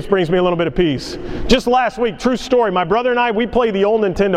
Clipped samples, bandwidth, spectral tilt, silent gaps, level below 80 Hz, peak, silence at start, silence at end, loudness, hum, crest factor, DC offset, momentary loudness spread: under 0.1%; 13.5 kHz; -5.5 dB/octave; none; -34 dBFS; 0 dBFS; 0 s; 0 s; -16 LUFS; none; 16 dB; under 0.1%; 4 LU